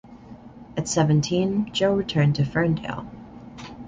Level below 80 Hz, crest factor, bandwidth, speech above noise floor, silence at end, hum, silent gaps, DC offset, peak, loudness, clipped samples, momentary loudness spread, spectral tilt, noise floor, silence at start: -50 dBFS; 18 dB; 9.4 kHz; 22 dB; 0 s; none; none; under 0.1%; -6 dBFS; -23 LUFS; under 0.1%; 21 LU; -6 dB/octave; -44 dBFS; 0.05 s